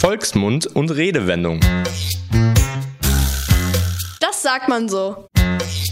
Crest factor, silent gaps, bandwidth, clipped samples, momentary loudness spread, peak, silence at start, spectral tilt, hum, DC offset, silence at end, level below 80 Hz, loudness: 16 dB; none; 16.5 kHz; under 0.1%; 5 LU; -2 dBFS; 0 s; -5 dB/octave; none; under 0.1%; 0 s; -26 dBFS; -18 LUFS